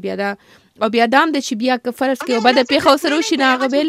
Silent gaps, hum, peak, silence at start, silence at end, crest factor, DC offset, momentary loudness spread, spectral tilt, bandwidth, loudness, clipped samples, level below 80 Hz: none; none; 0 dBFS; 0.05 s; 0 s; 16 dB; under 0.1%; 9 LU; -3.5 dB/octave; 16 kHz; -16 LUFS; under 0.1%; -60 dBFS